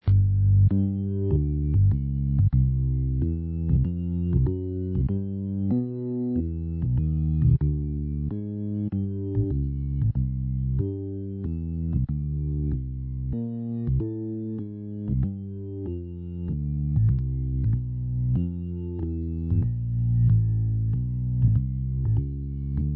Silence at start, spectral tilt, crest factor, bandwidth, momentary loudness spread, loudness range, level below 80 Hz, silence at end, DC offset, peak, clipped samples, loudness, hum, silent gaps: 0.05 s; -15 dB/octave; 14 dB; 2 kHz; 10 LU; 5 LU; -32 dBFS; 0 s; under 0.1%; -10 dBFS; under 0.1%; -26 LUFS; none; none